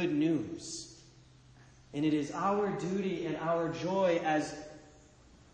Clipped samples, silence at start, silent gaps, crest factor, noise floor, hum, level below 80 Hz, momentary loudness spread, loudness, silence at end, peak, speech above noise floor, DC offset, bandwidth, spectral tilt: under 0.1%; 0 s; none; 14 dB; -59 dBFS; none; -64 dBFS; 14 LU; -33 LUFS; 0.65 s; -18 dBFS; 27 dB; under 0.1%; 9.8 kHz; -5.5 dB/octave